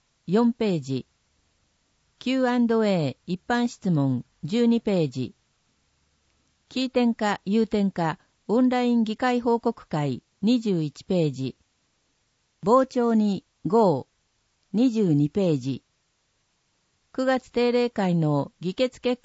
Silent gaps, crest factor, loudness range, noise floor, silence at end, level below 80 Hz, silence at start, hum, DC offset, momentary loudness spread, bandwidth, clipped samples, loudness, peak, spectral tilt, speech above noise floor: none; 18 dB; 3 LU; -71 dBFS; 0.1 s; -64 dBFS; 0.3 s; none; under 0.1%; 10 LU; 8 kHz; under 0.1%; -24 LUFS; -8 dBFS; -7 dB/octave; 48 dB